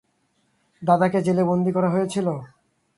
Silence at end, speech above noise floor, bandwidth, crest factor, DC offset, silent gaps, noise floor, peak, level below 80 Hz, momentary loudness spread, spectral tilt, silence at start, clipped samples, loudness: 0.5 s; 47 dB; 11.5 kHz; 18 dB; under 0.1%; none; -68 dBFS; -6 dBFS; -64 dBFS; 9 LU; -7.5 dB/octave; 0.8 s; under 0.1%; -22 LUFS